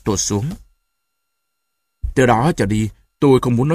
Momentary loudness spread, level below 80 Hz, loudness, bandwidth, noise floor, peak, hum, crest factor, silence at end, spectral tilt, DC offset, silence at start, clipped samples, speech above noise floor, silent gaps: 13 LU; -36 dBFS; -17 LUFS; 15.5 kHz; -75 dBFS; 0 dBFS; none; 18 dB; 0 s; -5.5 dB/octave; under 0.1%; 0.05 s; under 0.1%; 60 dB; none